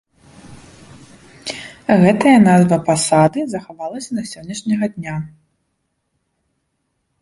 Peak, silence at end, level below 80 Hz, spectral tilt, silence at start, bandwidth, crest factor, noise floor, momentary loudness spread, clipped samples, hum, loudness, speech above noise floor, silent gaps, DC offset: -2 dBFS; 1.95 s; -54 dBFS; -6 dB/octave; 0.45 s; 11.5 kHz; 16 dB; -70 dBFS; 17 LU; under 0.1%; none; -15 LUFS; 56 dB; none; under 0.1%